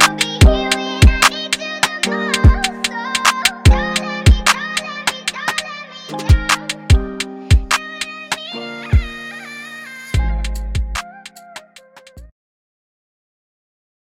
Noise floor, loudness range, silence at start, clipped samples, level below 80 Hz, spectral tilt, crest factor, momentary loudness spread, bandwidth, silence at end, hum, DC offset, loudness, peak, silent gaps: -44 dBFS; 12 LU; 0 s; under 0.1%; -20 dBFS; -4 dB/octave; 16 dB; 17 LU; 16.5 kHz; 1.9 s; none; under 0.1%; -16 LUFS; 0 dBFS; none